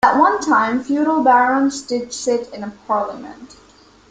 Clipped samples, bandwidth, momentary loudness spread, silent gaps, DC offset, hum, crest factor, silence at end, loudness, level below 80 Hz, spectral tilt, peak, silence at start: under 0.1%; 9.4 kHz; 17 LU; none; under 0.1%; none; 16 dB; 0.65 s; -17 LUFS; -56 dBFS; -3.5 dB/octave; -2 dBFS; 0.05 s